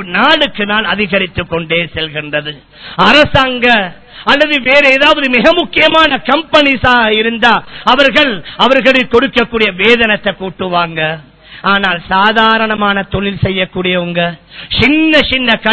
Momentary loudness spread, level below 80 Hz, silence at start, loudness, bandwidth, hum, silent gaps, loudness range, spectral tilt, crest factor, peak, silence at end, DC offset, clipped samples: 10 LU; -36 dBFS; 0 s; -10 LUFS; 8 kHz; none; none; 4 LU; -5.5 dB/octave; 10 dB; 0 dBFS; 0 s; under 0.1%; 0.9%